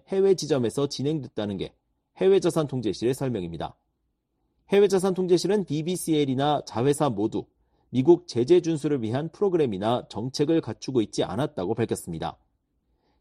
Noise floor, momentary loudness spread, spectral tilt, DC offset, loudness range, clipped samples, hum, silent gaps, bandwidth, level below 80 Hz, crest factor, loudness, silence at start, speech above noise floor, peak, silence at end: -76 dBFS; 11 LU; -6 dB/octave; under 0.1%; 3 LU; under 0.1%; none; none; 13.5 kHz; -60 dBFS; 18 dB; -25 LUFS; 0.1 s; 52 dB; -6 dBFS; 0.9 s